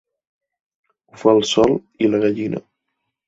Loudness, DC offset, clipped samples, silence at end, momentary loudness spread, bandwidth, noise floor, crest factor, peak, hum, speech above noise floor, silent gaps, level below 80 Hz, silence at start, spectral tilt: -18 LUFS; under 0.1%; under 0.1%; 0.65 s; 11 LU; 7.8 kHz; -77 dBFS; 18 dB; -2 dBFS; none; 60 dB; none; -56 dBFS; 1.15 s; -5 dB/octave